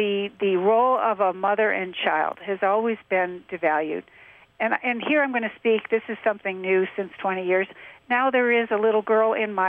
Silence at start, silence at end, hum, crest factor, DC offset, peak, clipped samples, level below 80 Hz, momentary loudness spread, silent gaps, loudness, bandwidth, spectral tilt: 0 s; 0 s; none; 16 dB; under 0.1%; -8 dBFS; under 0.1%; -72 dBFS; 7 LU; none; -23 LUFS; 3.9 kHz; -8 dB/octave